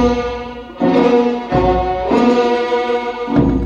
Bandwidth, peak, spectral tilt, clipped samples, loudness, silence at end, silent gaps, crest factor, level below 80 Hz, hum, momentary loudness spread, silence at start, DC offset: 7.6 kHz; 0 dBFS; -7 dB/octave; under 0.1%; -15 LUFS; 0 s; none; 14 dB; -30 dBFS; none; 8 LU; 0 s; under 0.1%